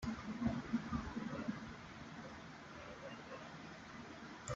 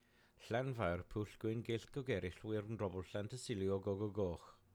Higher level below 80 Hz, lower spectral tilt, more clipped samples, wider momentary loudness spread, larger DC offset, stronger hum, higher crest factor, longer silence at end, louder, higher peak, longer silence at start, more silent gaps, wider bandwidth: about the same, -62 dBFS vs -64 dBFS; about the same, -6 dB/octave vs -6.5 dB/octave; neither; first, 11 LU vs 6 LU; neither; neither; about the same, 18 dB vs 16 dB; second, 0 s vs 0.2 s; second, -47 LUFS vs -43 LUFS; about the same, -26 dBFS vs -26 dBFS; second, 0 s vs 0.4 s; neither; second, 8 kHz vs 15.5 kHz